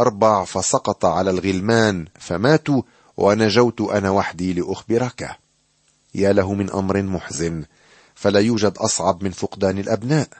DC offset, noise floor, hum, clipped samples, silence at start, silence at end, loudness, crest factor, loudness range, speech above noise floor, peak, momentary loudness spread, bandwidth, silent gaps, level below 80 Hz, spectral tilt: under 0.1%; -62 dBFS; none; under 0.1%; 0 s; 0.15 s; -19 LUFS; 18 dB; 4 LU; 43 dB; -2 dBFS; 9 LU; 8.8 kHz; none; -52 dBFS; -5 dB/octave